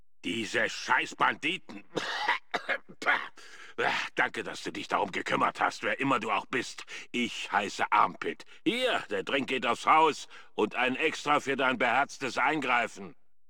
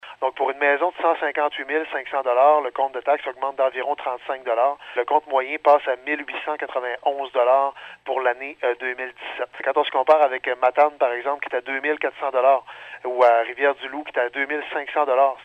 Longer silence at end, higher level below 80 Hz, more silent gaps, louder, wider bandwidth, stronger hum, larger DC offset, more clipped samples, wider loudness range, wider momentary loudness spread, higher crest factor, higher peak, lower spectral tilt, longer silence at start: first, 0.4 s vs 0 s; about the same, -74 dBFS vs -74 dBFS; neither; second, -29 LUFS vs -22 LUFS; first, 17.5 kHz vs 7.8 kHz; neither; first, 0.3% vs under 0.1%; neither; about the same, 4 LU vs 2 LU; about the same, 11 LU vs 10 LU; about the same, 20 dB vs 20 dB; second, -10 dBFS vs -2 dBFS; about the same, -3 dB/octave vs -3.5 dB/octave; first, 0.25 s vs 0.05 s